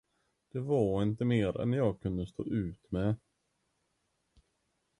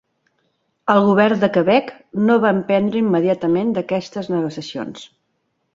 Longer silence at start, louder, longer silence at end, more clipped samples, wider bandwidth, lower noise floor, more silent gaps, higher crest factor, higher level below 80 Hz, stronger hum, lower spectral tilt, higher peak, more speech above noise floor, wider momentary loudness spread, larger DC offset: second, 0.55 s vs 0.85 s; second, -33 LUFS vs -18 LUFS; first, 1.85 s vs 0.7 s; neither; first, 10.5 kHz vs 7.6 kHz; first, -79 dBFS vs -70 dBFS; neither; about the same, 18 dB vs 18 dB; first, -54 dBFS vs -60 dBFS; neither; first, -9 dB/octave vs -7 dB/octave; second, -16 dBFS vs -2 dBFS; second, 48 dB vs 53 dB; second, 8 LU vs 14 LU; neither